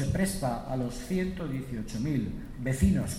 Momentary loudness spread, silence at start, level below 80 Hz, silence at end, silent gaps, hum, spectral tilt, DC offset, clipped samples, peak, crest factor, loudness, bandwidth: 9 LU; 0 s; -40 dBFS; 0 s; none; none; -6.5 dB/octave; under 0.1%; under 0.1%; -12 dBFS; 18 dB; -31 LUFS; 16 kHz